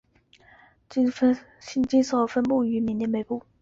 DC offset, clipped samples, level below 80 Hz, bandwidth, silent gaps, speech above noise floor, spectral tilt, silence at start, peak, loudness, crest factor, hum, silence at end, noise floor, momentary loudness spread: under 0.1%; under 0.1%; -60 dBFS; 7.6 kHz; none; 34 dB; -6 dB/octave; 0.9 s; -10 dBFS; -25 LUFS; 16 dB; none; 0.2 s; -58 dBFS; 9 LU